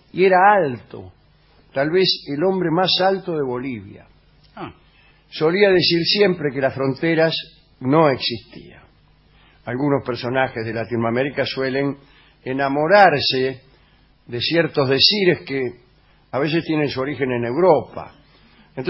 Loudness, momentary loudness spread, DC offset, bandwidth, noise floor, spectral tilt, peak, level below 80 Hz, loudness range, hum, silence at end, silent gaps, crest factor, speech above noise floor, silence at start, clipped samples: -18 LUFS; 20 LU; under 0.1%; 5.8 kHz; -54 dBFS; -8.5 dB/octave; 0 dBFS; -54 dBFS; 5 LU; none; 0 s; none; 20 dB; 36 dB; 0.15 s; under 0.1%